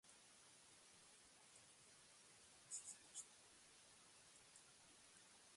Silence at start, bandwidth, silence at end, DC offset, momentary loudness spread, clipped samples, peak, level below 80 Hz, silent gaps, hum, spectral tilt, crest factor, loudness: 0.05 s; 11.5 kHz; 0 s; under 0.1%; 12 LU; under 0.1%; -38 dBFS; under -90 dBFS; none; none; 0 dB/octave; 26 dB; -62 LUFS